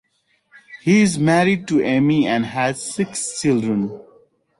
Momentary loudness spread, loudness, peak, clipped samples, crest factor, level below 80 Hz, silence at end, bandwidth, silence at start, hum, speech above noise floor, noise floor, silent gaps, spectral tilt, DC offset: 8 LU; -18 LUFS; -4 dBFS; under 0.1%; 14 dB; -58 dBFS; 0.6 s; 11.5 kHz; 0.7 s; none; 46 dB; -64 dBFS; none; -5.5 dB/octave; under 0.1%